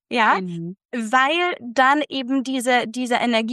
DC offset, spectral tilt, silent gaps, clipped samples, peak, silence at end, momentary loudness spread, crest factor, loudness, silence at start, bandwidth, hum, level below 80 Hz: under 0.1%; -4 dB/octave; 0.85-0.89 s; under 0.1%; -4 dBFS; 0 s; 11 LU; 16 dB; -20 LUFS; 0.1 s; 12.5 kHz; none; -76 dBFS